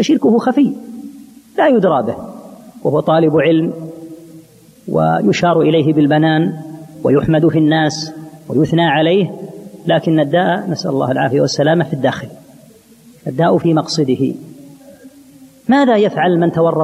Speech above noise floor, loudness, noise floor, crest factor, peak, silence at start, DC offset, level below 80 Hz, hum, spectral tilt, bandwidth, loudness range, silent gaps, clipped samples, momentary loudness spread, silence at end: 31 dB; -14 LUFS; -44 dBFS; 14 dB; 0 dBFS; 0 s; under 0.1%; -52 dBFS; none; -6.5 dB/octave; 13 kHz; 3 LU; none; under 0.1%; 18 LU; 0 s